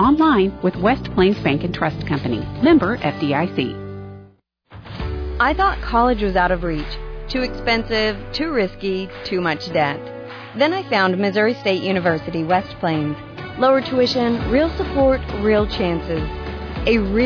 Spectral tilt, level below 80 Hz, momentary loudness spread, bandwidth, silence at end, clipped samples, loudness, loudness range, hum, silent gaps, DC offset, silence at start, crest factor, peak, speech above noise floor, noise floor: -7 dB/octave; -34 dBFS; 12 LU; 5.4 kHz; 0 s; under 0.1%; -19 LUFS; 3 LU; none; none; under 0.1%; 0 s; 14 dB; -4 dBFS; 32 dB; -50 dBFS